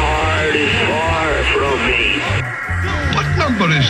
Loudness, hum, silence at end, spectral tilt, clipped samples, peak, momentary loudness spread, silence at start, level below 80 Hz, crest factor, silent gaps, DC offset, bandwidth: -15 LUFS; none; 0 s; -5 dB/octave; under 0.1%; -4 dBFS; 5 LU; 0 s; -28 dBFS; 12 dB; none; under 0.1%; 12 kHz